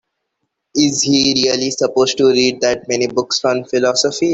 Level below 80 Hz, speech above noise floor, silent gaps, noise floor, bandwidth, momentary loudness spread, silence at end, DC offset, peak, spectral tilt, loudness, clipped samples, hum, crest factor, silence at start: -54 dBFS; 58 dB; none; -73 dBFS; 8.4 kHz; 5 LU; 0 s; under 0.1%; 0 dBFS; -3 dB/octave; -15 LUFS; under 0.1%; none; 16 dB; 0.75 s